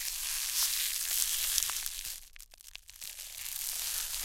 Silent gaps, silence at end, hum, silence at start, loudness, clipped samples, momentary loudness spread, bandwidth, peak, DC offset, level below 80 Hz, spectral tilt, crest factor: none; 0 s; none; 0 s; -31 LUFS; under 0.1%; 20 LU; 17 kHz; -4 dBFS; under 0.1%; -56 dBFS; 3.5 dB/octave; 32 dB